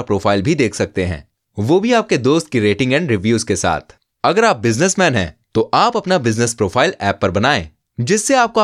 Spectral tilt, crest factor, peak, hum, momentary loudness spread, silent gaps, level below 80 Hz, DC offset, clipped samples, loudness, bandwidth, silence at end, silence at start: -4.5 dB/octave; 16 dB; 0 dBFS; none; 7 LU; none; -44 dBFS; under 0.1%; under 0.1%; -16 LUFS; 13.5 kHz; 0 s; 0 s